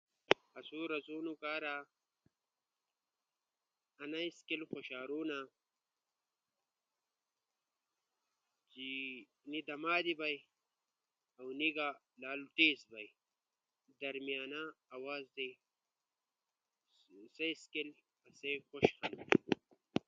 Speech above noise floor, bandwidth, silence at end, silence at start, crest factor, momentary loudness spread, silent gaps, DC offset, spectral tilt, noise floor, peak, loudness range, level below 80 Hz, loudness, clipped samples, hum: over 50 dB; 7.2 kHz; 0.1 s; 0.3 s; 36 dB; 15 LU; none; under 0.1%; -1.5 dB/octave; under -90 dBFS; -6 dBFS; 11 LU; -80 dBFS; -39 LUFS; under 0.1%; none